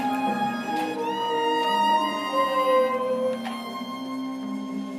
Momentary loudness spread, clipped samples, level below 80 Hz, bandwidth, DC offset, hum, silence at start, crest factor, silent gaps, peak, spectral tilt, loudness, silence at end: 11 LU; under 0.1%; -78 dBFS; 15.5 kHz; under 0.1%; none; 0 s; 14 dB; none; -12 dBFS; -4.5 dB/octave; -25 LUFS; 0 s